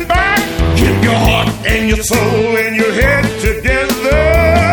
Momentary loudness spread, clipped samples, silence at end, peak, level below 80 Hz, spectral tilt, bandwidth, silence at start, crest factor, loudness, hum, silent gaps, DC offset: 4 LU; under 0.1%; 0 s; 0 dBFS; -20 dBFS; -5 dB/octave; over 20 kHz; 0 s; 12 dB; -12 LUFS; none; none; under 0.1%